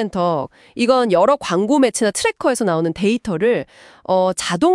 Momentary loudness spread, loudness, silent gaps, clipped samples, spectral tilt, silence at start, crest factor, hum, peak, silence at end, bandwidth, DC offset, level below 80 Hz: 8 LU; -17 LUFS; none; under 0.1%; -4.5 dB/octave; 0 s; 16 dB; none; -2 dBFS; 0 s; 12 kHz; under 0.1%; -54 dBFS